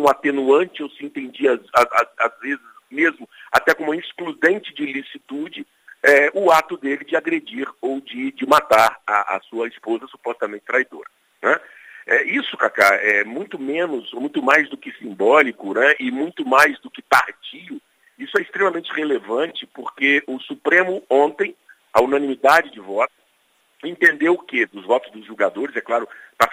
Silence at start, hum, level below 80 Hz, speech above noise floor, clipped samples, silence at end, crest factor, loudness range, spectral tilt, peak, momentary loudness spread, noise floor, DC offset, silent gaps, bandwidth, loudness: 0 s; none; -62 dBFS; 43 dB; under 0.1%; 0 s; 20 dB; 4 LU; -3.5 dB/octave; 0 dBFS; 15 LU; -62 dBFS; under 0.1%; none; 16 kHz; -19 LUFS